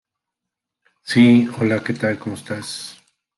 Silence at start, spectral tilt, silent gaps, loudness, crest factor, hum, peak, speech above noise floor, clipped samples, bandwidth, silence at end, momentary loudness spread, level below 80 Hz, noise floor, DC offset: 1.05 s; -6 dB/octave; none; -18 LUFS; 18 dB; none; -2 dBFS; 66 dB; under 0.1%; 12 kHz; 0.45 s; 18 LU; -64 dBFS; -84 dBFS; under 0.1%